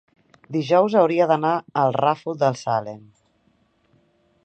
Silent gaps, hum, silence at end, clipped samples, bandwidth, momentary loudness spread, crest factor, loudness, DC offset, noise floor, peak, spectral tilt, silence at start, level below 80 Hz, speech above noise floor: none; none; 1.45 s; under 0.1%; 8.6 kHz; 10 LU; 20 dB; -20 LUFS; under 0.1%; -64 dBFS; -4 dBFS; -6.5 dB/octave; 0.5 s; -70 dBFS; 44 dB